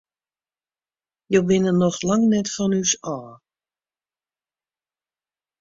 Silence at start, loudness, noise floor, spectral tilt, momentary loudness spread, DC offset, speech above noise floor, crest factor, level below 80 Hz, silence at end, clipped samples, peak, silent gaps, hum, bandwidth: 1.3 s; -20 LUFS; under -90 dBFS; -5 dB/octave; 7 LU; under 0.1%; over 70 dB; 20 dB; -60 dBFS; 2.25 s; under 0.1%; -4 dBFS; none; none; 7.8 kHz